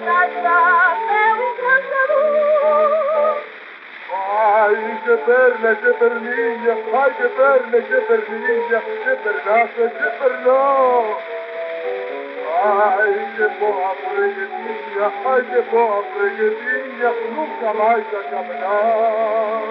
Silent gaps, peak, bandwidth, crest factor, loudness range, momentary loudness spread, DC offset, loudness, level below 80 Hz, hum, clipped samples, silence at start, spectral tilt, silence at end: none; -4 dBFS; 5.4 kHz; 14 dB; 3 LU; 11 LU; under 0.1%; -17 LUFS; under -90 dBFS; none; under 0.1%; 0 s; -0.5 dB/octave; 0 s